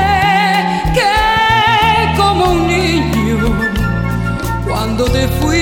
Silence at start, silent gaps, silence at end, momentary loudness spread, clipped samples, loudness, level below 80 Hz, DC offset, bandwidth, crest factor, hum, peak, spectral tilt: 0 s; none; 0 s; 7 LU; under 0.1%; -13 LUFS; -24 dBFS; under 0.1%; 17 kHz; 12 dB; none; -2 dBFS; -5 dB/octave